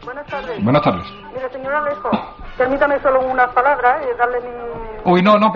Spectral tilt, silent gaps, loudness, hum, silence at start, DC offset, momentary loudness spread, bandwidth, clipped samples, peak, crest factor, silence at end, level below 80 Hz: -4.5 dB/octave; none; -17 LUFS; none; 0 s; under 0.1%; 14 LU; 6.8 kHz; under 0.1%; -2 dBFS; 14 dB; 0 s; -42 dBFS